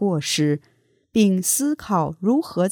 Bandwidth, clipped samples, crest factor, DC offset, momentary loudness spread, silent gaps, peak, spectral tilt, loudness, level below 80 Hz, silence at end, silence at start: 19 kHz; under 0.1%; 14 dB; under 0.1%; 5 LU; none; -6 dBFS; -4.5 dB/octave; -21 LUFS; -58 dBFS; 0 s; 0 s